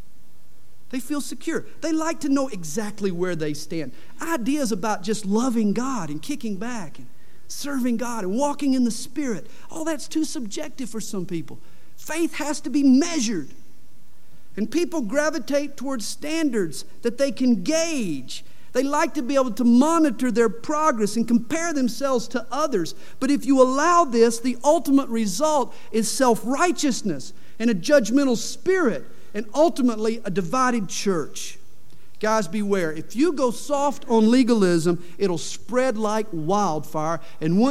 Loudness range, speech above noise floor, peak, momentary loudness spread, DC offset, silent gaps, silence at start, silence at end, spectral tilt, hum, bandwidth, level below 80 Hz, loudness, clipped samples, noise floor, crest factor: 6 LU; 35 dB; -4 dBFS; 13 LU; 4%; none; 0.9 s; 0 s; -4.5 dB/octave; none; 16 kHz; -62 dBFS; -23 LUFS; under 0.1%; -57 dBFS; 18 dB